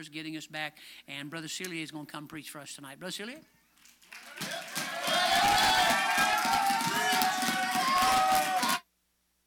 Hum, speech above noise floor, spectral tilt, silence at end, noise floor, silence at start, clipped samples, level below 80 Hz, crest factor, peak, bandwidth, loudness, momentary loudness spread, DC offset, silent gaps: none; 34 dB; -1.5 dB/octave; 0.65 s; -75 dBFS; 0 s; under 0.1%; -62 dBFS; 28 dB; -2 dBFS; over 20 kHz; -28 LUFS; 18 LU; under 0.1%; none